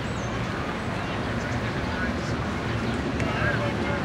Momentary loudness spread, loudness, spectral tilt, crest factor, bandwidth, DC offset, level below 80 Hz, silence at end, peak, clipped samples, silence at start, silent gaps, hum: 4 LU; -28 LUFS; -6 dB/octave; 14 dB; 12.5 kHz; under 0.1%; -40 dBFS; 0 s; -12 dBFS; under 0.1%; 0 s; none; none